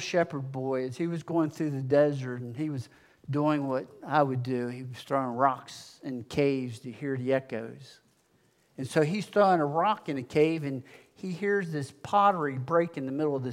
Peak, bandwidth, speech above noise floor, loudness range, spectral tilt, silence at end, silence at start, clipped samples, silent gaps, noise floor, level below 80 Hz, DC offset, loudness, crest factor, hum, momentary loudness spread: -10 dBFS; 15.5 kHz; 39 dB; 4 LU; -7 dB/octave; 0 s; 0 s; under 0.1%; none; -67 dBFS; -72 dBFS; under 0.1%; -29 LUFS; 20 dB; none; 14 LU